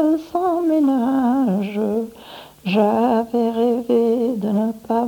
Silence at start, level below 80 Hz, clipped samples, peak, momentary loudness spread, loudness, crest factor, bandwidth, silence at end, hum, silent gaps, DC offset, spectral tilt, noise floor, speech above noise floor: 0 s; -58 dBFS; under 0.1%; -6 dBFS; 7 LU; -19 LUFS; 12 dB; 19 kHz; 0 s; none; none; under 0.1%; -7.5 dB/octave; -40 dBFS; 23 dB